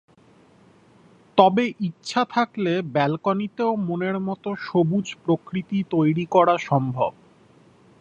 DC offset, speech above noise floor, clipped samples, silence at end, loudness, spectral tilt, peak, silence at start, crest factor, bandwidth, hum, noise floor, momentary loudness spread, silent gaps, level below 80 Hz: under 0.1%; 33 dB; under 0.1%; 0.9 s; -23 LUFS; -7 dB/octave; 0 dBFS; 1.35 s; 22 dB; 8.8 kHz; none; -54 dBFS; 8 LU; none; -64 dBFS